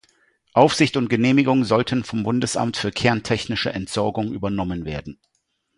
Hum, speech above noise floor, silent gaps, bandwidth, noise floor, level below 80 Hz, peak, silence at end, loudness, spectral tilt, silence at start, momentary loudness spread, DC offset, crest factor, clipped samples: none; 41 dB; none; 11.5 kHz; -62 dBFS; -48 dBFS; 0 dBFS; 0.65 s; -21 LUFS; -5.5 dB/octave; 0.55 s; 9 LU; under 0.1%; 20 dB; under 0.1%